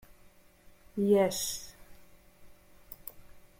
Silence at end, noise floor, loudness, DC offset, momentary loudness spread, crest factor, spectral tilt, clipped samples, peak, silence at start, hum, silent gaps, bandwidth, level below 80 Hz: 0.2 s; -59 dBFS; -30 LUFS; under 0.1%; 23 LU; 20 dB; -4.5 dB/octave; under 0.1%; -14 dBFS; 0.95 s; none; none; 16.5 kHz; -62 dBFS